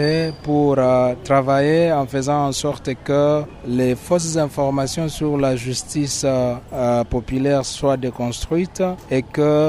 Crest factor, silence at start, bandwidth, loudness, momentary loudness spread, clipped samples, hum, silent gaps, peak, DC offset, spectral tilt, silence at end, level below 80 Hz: 16 dB; 0 s; 15.5 kHz; -19 LUFS; 7 LU; under 0.1%; none; none; -4 dBFS; under 0.1%; -5.5 dB/octave; 0 s; -40 dBFS